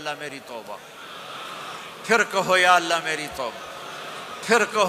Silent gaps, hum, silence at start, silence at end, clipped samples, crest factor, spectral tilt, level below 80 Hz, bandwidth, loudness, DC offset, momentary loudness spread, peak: none; none; 0 s; 0 s; under 0.1%; 20 dB; -2 dB/octave; -64 dBFS; 15.5 kHz; -22 LUFS; under 0.1%; 19 LU; -4 dBFS